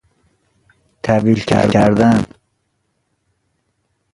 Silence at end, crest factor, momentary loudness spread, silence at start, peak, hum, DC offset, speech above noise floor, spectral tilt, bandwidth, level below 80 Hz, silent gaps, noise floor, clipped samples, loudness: 1.9 s; 18 dB; 10 LU; 1.05 s; 0 dBFS; none; under 0.1%; 55 dB; -7 dB/octave; 11.5 kHz; -44 dBFS; none; -67 dBFS; under 0.1%; -14 LUFS